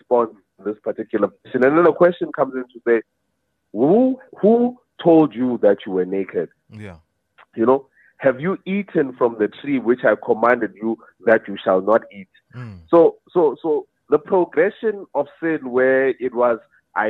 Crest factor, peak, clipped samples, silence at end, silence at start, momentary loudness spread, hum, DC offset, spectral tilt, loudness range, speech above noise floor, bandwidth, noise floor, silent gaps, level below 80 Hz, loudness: 16 dB; -2 dBFS; under 0.1%; 0 s; 0.1 s; 12 LU; none; under 0.1%; -9.5 dB/octave; 4 LU; 54 dB; 4.4 kHz; -72 dBFS; none; -66 dBFS; -19 LUFS